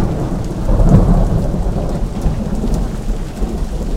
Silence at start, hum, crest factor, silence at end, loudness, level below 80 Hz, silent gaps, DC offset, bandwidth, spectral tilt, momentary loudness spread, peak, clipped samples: 0 s; none; 14 dB; 0 s; -18 LUFS; -16 dBFS; none; 1%; 11.5 kHz; -8 dB/octave; 11 LU; 0 dBFS; under 0.1%